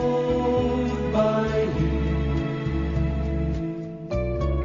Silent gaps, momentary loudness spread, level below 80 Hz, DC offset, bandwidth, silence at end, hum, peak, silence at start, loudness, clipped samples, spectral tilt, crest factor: none; 6 LU; -30 dBFS; under 0.1%; 7.2 kHz; 0 s; none; -10 dBFS; 0 s; -25 LUFS; under 0.1%; -7.5 dB/octave; 14 dB